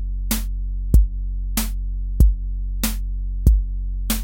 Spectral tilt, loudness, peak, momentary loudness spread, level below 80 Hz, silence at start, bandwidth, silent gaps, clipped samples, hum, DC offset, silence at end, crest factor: -5 dB/octave; -23 LUFS; -2 dBFS; 10 LU; -20 dBFS; 0 s; 17 kHz; none; under 0.1%; none; under 0.1%; 0 s; 18 dB